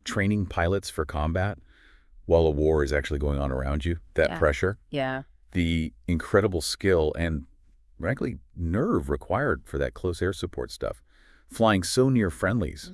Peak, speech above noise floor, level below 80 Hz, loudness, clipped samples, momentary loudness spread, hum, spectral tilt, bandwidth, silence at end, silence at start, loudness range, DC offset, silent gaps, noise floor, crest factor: -6 dBFS; 31 dB; -38 dBFS; -26 LUFS; under 0.1%; 11 LU; none; -6 dB/octave; 12 kHz; 0 s; 0.05 s; 3 LU; under 0.1%; none; -56 dBFS; 20 dB